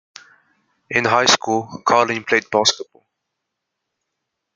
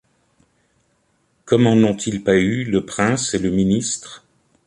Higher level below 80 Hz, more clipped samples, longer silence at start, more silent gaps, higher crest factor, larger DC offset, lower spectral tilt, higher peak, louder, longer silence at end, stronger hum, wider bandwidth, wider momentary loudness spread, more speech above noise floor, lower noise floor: second, -66 dBFS vs -48 dBFS; neither; second, 0.9 s vs 1.45 s; neither; first, 22 dB vs 16 dB; neither; second, -2 dB/octave vs -5 dB/octave; about the same, 0 dBFS vs -2 dBFS; about the same, -17 LUFS vs -18 LUFS; first, 1.7 s vs 0.5 s; neither; about the same, 12 kHz vs 11.5 kHz; about the same, 8 LU vs 7 LU; first, 61 dB vs 47 dB; first, -79 dBFS vs -64 dBFS